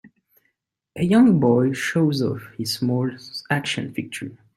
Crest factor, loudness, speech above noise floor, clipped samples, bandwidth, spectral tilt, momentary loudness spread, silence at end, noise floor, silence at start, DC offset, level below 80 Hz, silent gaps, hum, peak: 18 dB; -21 LUFS; 54 dB; under 0.1%; 14.5 kHz; -6 dB/octave; 16 LU; 0.2 s; -75 dBFS; 0.95 s; under 0.1%; -60 dBFS; none; none; -4 dBFS